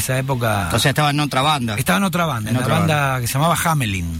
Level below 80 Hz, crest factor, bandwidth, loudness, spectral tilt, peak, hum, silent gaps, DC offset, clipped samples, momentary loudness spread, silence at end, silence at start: -40 dBFS; 14 dB; 16.5 kHz; -18 LUFS; -4.5 dB/octave; -4 dBFS; none; none; under 0.1%; under 0.1%; 4 LU; 0 s; 0 s